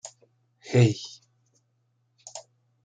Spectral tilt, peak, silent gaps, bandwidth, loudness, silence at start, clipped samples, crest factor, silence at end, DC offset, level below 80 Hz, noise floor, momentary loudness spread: -6.5 dB/octave; -6 dBFS; none; 9.2 kHz; -24 LUFS; 0.05 s; under 0.1%; 24 dB; 0.45 s; under 0.1%; -66 dBFS; -72 dBFS; 26 LU